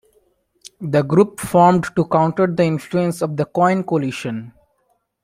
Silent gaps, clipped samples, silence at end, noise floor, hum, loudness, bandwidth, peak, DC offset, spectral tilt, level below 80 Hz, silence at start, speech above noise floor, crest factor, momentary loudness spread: none; under 0.1%; 0.75 s; -66 dBFS; none; -18 LUFS; 15.5 kHz; -2 dBFS; under 0.1%; -7 dB/octave; -54 dBFS; 0.8 s; 49 dB; 16 dB; 11 LU